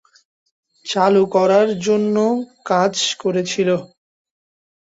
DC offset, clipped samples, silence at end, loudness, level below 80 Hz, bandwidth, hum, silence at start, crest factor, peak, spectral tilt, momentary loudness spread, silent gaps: under 0.1%; under 0.1%; 1 s; -17 LUFS; -64 dBFS; 8 kHz; none; 0.85 s; 16 dB; -2 dBFS; -4.5 dB/octave; 9 LU; none